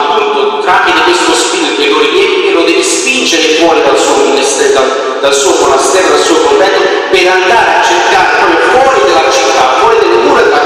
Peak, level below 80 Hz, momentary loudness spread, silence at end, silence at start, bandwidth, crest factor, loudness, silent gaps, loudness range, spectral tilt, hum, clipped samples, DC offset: 0 dBFS; -44 dBFS; 3 LU; 0 s; 0 s; 15 kHz; 8 dB; -7 LUFS; none; 1 LU; -1.5 dB/octave; none; 0.2%; under 0.1%